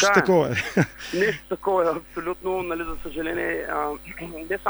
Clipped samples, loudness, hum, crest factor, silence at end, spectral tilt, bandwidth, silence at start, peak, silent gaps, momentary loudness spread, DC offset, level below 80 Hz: under 0.1%; -25 LUFS; none; 22 dB; 0 s; -5 dB/octave; over 20 kHz; 0 s; -2 dBFS; none; 11 LU; under 0.1%; -46 dBFS